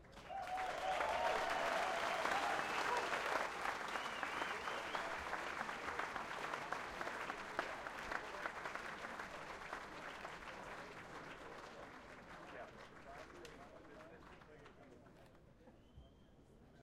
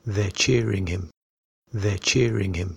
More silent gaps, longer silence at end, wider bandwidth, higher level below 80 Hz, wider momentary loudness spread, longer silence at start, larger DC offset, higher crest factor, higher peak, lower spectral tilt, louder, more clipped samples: second, none vs 1.17-1.62 s; about the same, 0 s vs 0 s; first, 16 kHz vs 11.5 kHz; second, -68 dBFS vs -44 dBFS; first, 20 LU vs 12 LU; about the same, 0 s vs 0.05 s; neither; first, 22 dB vs 16 dB; second, -24 dBFS vs -8 dBFS; second, -2.5 dB/octave vs -4.5 dB/octave; second, -43 LUFS vs -23 LUFS; neither